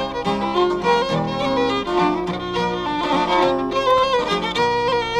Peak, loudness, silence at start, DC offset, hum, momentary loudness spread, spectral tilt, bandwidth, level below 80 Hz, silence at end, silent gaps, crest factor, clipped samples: -4 dBFS; -19 LUFS; 0 s; under 0.1%; none; 5 LU; -5 dB/octave; 12.5 kHz; -44 dBFS; 0 s; none; 14 dB; under 0.1%